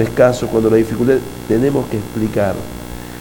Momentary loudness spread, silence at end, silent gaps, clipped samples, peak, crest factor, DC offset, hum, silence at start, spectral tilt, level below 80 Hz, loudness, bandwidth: 13 LU; 0 s; none; under 0.1%; 0 dBFS; 16 dB; under 0.1%; 60 Hz at -30 dBFS; 0 s; -7 dB/octave; -38 dBFS; -16 LUFS; 19 kHz